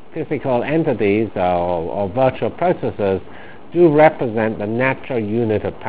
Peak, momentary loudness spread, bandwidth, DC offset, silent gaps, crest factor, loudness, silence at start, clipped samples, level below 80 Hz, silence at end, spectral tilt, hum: 0 dBFS; 8 LU; 4 kHz; 2%; none; 18 dB; -18 LUFS; 0.1 s; under 0.1%; -44 dBFS; 0 s; -11 dB/octave; none